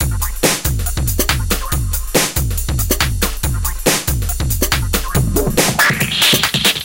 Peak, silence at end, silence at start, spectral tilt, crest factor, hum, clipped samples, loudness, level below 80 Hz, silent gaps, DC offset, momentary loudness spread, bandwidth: 0 dBFS; 0 s; 0 s; -3 dB/octave; 16 dB; none; under 0.1%; -15 LUFS; -22 dBFS; none; 0.8%; 7 LU; 17.5 kHz